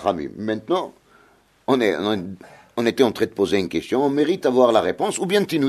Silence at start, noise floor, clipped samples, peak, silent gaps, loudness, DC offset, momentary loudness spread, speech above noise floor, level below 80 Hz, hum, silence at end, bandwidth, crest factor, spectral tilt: 0 s; -56 dBFS; under 0.1%; -2 dBFS; none; -21 LUFS; under 0.1%; 11 LU; 36 dB; -58 dBFS; none; 0 s; 13.5 kHz; 18 dB; -5 dB/octave